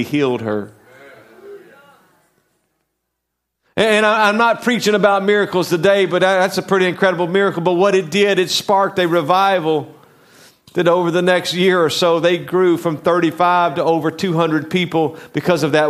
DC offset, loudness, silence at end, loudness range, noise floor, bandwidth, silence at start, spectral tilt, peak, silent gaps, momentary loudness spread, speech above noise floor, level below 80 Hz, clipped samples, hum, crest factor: under 0.1%; -15 LUFS; 0 s; 5 LU; -76 dBFS; 15 kHz; 0 s; -5 dB/octave; 0 dBFS; none; 5 LU; 61 dB; -64 dBFS; under 0.1%; none; 16 dB